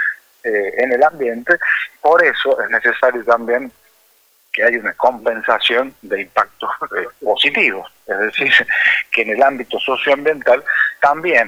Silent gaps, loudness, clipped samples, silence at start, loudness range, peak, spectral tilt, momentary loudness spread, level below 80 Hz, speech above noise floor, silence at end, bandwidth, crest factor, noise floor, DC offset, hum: none; -15 LUFS; under 0.1%; 0 s; 3 LU; -2 dBFS; -3.5 dB/octave; 9 LU; -60 dBFS; 39 dB; 0 s; over 20 kHz; 16 dB; -55 dBFS; under 0.1%; none